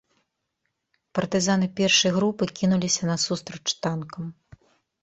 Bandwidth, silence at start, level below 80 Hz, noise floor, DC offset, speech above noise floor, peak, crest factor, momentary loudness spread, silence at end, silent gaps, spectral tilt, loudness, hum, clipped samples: 8.2 kHz; 1.15 s; -60 dBFS; -78 dBFS; under 0.1%; 54 dB; -8 dBFS; 18 dB; 13 LU; 0.7 s; none; -4 dB/octave; -23 LUFS; none; under 0.1%